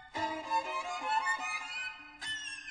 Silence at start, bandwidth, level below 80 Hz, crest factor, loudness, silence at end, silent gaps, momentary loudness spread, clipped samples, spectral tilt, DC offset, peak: 0 s; 10 kHz; -70 dBFS; 16 dB; -35 LUFS; 0 s; none; 7 LU; under 0.1%; -1 dB/octave; under 0.1%; -20 dBFS